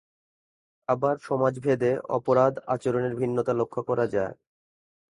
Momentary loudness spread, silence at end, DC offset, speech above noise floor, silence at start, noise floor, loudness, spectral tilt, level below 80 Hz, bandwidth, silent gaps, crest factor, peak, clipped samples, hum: 7 LU; 0.8 s; under 0.1%; over 65 dB; 0.9 s; under -90 dBFS; -26 LUFS; -8 dB/octave; -64 dBFS; 11 kHz; none; 20 dB; -8 dBFS; under 0.1%; none